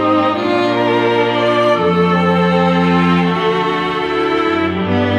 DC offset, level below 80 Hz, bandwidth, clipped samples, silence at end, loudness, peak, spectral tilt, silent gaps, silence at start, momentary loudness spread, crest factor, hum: under 0.1%; -48 dBFS; 9 kHz; under 0.1%; 0 s; -14 LUFS; -2 dBFS; -7 dB/octave; none; 0 s; 4 LU; 12 dB; none